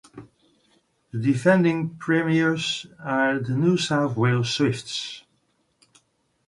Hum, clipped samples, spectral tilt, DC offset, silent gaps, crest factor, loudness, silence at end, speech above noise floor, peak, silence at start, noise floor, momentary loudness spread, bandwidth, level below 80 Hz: none; under 0.1%; -5.5 dB/octave; under 0.1%; none; 18 dB; -23 LUFS; 1.3 s; 46 dB; -6 dBFS; 0.15 s; -68 dBFS; 11 LU; 11.5 kHz; -64 dBFS